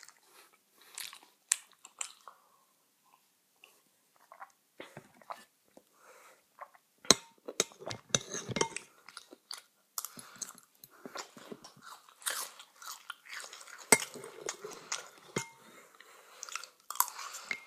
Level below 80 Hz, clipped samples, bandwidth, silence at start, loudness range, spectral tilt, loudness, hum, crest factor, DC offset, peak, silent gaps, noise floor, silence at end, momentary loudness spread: -74 dBFS; under 0.1%; 15.5 kHz; 0.35 s; 21 LU; -1 dB/octave; -35 LUFS; none; 40 dB; under 0.1%; 0 dBFS; none; -71 dBFS; 0 s; 28 LU